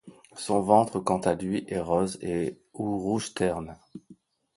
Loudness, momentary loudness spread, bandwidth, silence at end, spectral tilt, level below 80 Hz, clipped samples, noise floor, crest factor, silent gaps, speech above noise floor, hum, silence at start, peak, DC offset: -27 LUFS; 15 LU; 11.5 kHz; 0.45 s; -6 dB/octave; -56 dBFS; under 0.1%; -56 dBFS; 22 dB; none; 30 dB; none; 0.05 s; -6 dBFS; under 0.1%